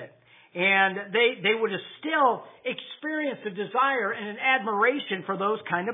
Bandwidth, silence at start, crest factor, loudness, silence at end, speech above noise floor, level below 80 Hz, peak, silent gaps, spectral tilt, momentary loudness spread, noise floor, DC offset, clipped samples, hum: 3.9 kHz; 0 s; 20 dB; -25 LUFS; 0 s; 26 dB; -86 dBFS; -6 dBFS; none; -7.5 dB/octave; 11 LU; -52 dBFS; under 0.1%; under 0.1%; none